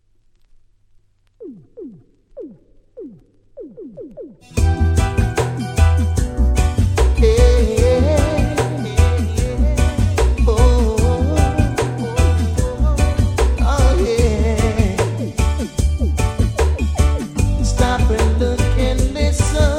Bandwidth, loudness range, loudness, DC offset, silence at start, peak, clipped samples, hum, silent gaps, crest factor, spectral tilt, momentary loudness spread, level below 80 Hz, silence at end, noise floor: 14 kHz; 6 LU; -17 LUFS; under 0.1%; 1.4 s; 0 dBFS; under 0.1%; none; none; 16 dB; -6 dB/octave; 21 LU; -20 dBFS; 0 s; -54 dBFS